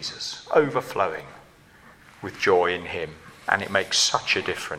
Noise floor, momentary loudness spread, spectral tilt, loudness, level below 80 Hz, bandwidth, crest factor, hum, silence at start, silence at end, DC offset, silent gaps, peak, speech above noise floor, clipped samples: -52 dBFS; 15 LU; -2 dB/octave; -23 LUFS; -60 dBFS; 15.5 kHz; 22 dB; none; 0 s; 0 s; under 0.1%; none; -4 dBFS; 28 dB; under 0.1%